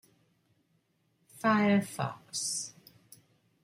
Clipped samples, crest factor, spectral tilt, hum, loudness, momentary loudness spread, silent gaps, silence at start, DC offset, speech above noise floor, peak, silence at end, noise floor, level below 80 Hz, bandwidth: under 0.1%; 18 dB; -4 dB/octave; none; -30 LUFS; 11 LU; none; 1.35 s; under 0.1%; 44 dB; -16 dBFS; 0.95 s; -74 dBFS; -76 dBFS; 16 kHz